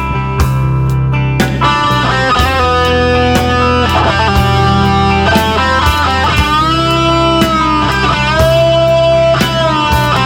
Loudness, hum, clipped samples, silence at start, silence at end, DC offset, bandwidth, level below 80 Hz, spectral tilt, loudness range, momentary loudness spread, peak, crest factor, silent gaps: -10 LUFS; none; under 0.1%; 0 s; 0 s; under 0.1%; 18 kHz; -22 dBFS; -5.5 dB/octave; 1 LU; 4 LU; 0 dBFS; 10 dB; none